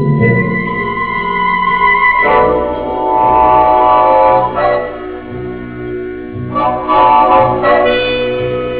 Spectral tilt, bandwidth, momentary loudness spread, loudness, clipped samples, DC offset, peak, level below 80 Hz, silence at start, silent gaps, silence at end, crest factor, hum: -9.5 dB/octave; 4 kHz; 15 LU; -11 LUFS; under 0.1%; 0.5%; 0 dBFS; -34 dBFS; 0 s; none; 0 s; 12 dB; none